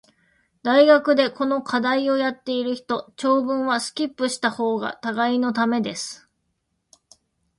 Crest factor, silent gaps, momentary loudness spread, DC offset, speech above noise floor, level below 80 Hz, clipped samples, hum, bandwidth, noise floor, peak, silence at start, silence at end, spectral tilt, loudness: 20 dB; none; 11 LU; under 0.1%; 53 dB; -68 dBFS; under 0.1%; none; 11.5 kHz; -74 dBFS; -2 dBFS; 0.65 s; 1.45 s; -3.5 dB/octave; -21 LUFS